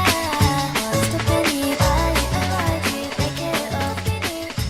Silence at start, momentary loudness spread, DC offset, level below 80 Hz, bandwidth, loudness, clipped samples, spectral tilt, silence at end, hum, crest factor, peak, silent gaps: 0 s; 5 LU; under 0.1%; -32 dBFS; 16.5 kHz; -21 LUFS; under 0.1%; -4.5 dB/octave; 0 s; none; 18 dB; -4 dBFS; none